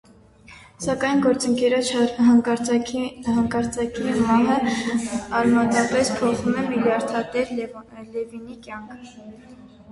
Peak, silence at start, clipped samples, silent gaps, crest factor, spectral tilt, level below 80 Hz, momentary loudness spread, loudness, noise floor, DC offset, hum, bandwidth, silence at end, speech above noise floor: -6 dBFS; 0.5 s; under 0.1%; none; 16 dB; -4.5 dB/octave; -52 dBFS; 17 LU; -21 LUFS; -49 dBFS; under 0.1%; none; 11.5 kHz; 0 s; 27 dB